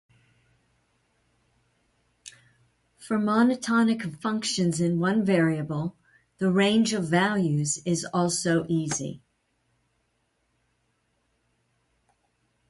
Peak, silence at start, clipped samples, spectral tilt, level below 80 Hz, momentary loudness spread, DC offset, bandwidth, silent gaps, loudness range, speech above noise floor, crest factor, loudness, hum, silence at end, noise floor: -8 dBFS; 2.25 s; under 0.1%; -5 dB/octave; -66 dBFS; 8 LU; under 0.1%; 11.5 kHz; none; 8 LU; 49 dB; 18 dB; -25 LUFS; none; 3.55 s; -73 dBFS